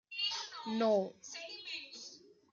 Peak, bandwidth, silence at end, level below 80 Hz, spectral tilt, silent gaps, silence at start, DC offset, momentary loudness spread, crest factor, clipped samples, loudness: -20 dBFS; 7.6 kHz; 0.25 s; -88 dBFS; -3.5 dB/octave; none; 0.1 s; under 0.1%; 16 LU; 18 dB; under 0.1%; -37 LUFS